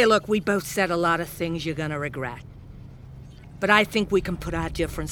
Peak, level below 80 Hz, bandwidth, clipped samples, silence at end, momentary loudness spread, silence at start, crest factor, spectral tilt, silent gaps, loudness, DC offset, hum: -2 dBFS; -42 dBFS; over 20 kHz; under 0.1%; 0 s; 25 LU; 0 s; 24 dB; -5 dB/octave; none; -24 LUFS; under 0.1%; none